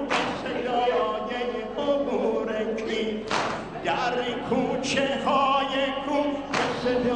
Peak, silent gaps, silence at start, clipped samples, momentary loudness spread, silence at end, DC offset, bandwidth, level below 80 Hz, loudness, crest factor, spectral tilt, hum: -10 dBFS; none; 0 s; under 0.1%; 6 LU; 0 s; 0.1%; 10 kHz; -54 dBFS; -26 LUFS; 16 dB; -4.5 dB/octave; none